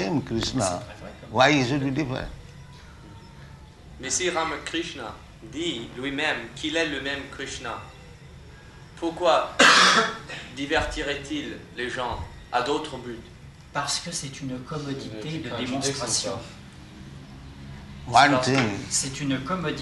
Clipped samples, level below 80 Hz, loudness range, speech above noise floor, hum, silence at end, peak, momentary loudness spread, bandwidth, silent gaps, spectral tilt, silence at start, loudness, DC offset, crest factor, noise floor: under 0.1%; -48 dBFS; 9 LU; 20 dB; none; 0 s; -4 dBFS; 23 LU; 12 kHz; none; -3 dB/octave; 0 s; -24 LUFS; under 0.1%; 24 dB; -46 dBFS